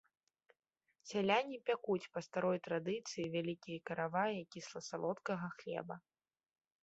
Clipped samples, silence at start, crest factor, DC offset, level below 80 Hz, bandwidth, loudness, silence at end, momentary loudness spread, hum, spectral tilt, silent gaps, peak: under 0.1%; 1.05 s; 20 dB; under 0.1%; -82 dBFS; 8 kHz; -40 LUFS; 0.85 s; 11 LU; none; -4 dB/octave; none; -20 dBFS